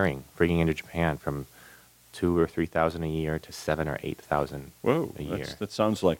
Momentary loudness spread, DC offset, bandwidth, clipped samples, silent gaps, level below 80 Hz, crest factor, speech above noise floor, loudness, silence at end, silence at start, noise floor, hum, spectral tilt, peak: 9 LU; under 0.1%; 17 kHz; under 0.1%; none; -46 dBFS; 20 dB; 26 dB; -29 LUFS; 0 s; 0 s; -54 dBFS; none; -6.5 dB/octave; -10 dBFS